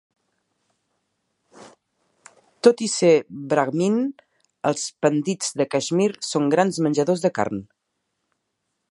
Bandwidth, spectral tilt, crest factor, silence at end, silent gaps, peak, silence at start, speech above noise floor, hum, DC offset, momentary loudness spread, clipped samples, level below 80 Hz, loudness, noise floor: 11.5 kHz; -5 dB/octave; 22 dB; 1.25 s; none; -2 dBFS; 1.6 s; 56 dB; none; under 0.1%; 7 LU; under 0.1%; -68 dBFS; -21 LUFS; -77 dBFS